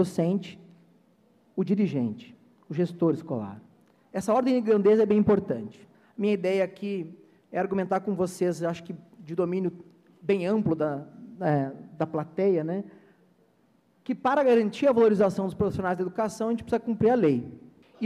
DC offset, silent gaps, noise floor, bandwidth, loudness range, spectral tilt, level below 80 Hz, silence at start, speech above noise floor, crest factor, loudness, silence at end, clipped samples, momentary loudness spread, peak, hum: under 0.1%; none; -65 dBFS; 13 kHz; 5 LU; -7.5 dB/octave; -62 dBFS; 0 s; 39 dB; 16 dB; -26 LUFS; 0 s; under 0.1%; 15 LU; -12 dBFS; none